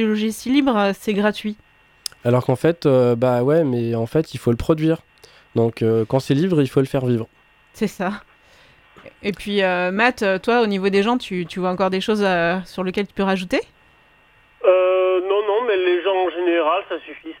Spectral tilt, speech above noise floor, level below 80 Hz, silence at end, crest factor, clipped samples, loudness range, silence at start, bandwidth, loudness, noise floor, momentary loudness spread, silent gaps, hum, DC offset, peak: -6.5 dB/octave; 35 dB; -50 dBFS; 0.05 s; 18 dB; under 0.1%; 3 LU; 0 s; 17 kHz; -20 LUFS; -54 dBFS; 10 LU; none; none; under 0.1%; 0 dBFS